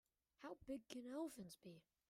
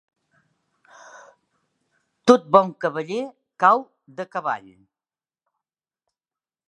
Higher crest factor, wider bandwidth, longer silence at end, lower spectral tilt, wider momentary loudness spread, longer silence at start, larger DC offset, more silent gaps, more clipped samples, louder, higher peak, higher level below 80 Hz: about the same, 20 dB vs 24 dB; first, 16 kHz vs 10.5 kHz; second, 0.3 s vs 2.1 s; about the same, -5 dB/octave vs -5.5 dB/octave; second, 12 LU vs 17 LU; second, 0.4 s vs 2.25 s; neither; neither; neither; second, -54 LUFS vs -21 LUFS; second, -34 dBFS vs 0 dBFS; second, -82 dBFS vs -72 dBFS